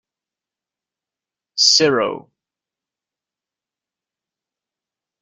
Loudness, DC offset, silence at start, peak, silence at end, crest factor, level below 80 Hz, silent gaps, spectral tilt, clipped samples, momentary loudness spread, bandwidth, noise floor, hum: -14 LUFS; under 0.1%; 1.55 s; -2 dBFS; 3 s; 24 dB; -68 dBFS; none; -1.5 dB/octave; under 0.1%; 18 LU; 11.5 kHz; -89 dBFS; none